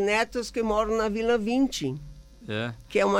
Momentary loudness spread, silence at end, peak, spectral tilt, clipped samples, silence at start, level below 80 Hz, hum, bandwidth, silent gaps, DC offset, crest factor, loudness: 9 LU; 0 s; -12 dBFS; -5 dB/octave; under 0.1%; 0 s; -48 dBFS; none; 16 kHz; none; under 0.1%; 14 dB; -27 LUFS